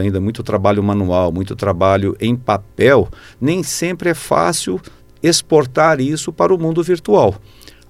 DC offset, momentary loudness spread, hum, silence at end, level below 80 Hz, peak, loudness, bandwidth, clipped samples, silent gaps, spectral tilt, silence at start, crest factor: under 0.1%; 8 LU; none; 0.5 s; -44 dBFS; 0 dBFS; -16 LUFS; 16 kHz; under 0.1%; none; -5 dB/octave; 0 s; 16 dB